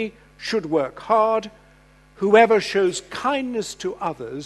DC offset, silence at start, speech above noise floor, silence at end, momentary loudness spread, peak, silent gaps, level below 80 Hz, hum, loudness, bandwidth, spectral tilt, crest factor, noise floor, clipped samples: under 0.1%; 0 s; 31 dB; 0 s; 14 LU; 0 dBFS; none; -56 dBFS; none; -21 LUFS; 12.5 kHz; -4.5 dB/octave; 22 dB; -52 dBFS; under 0.1%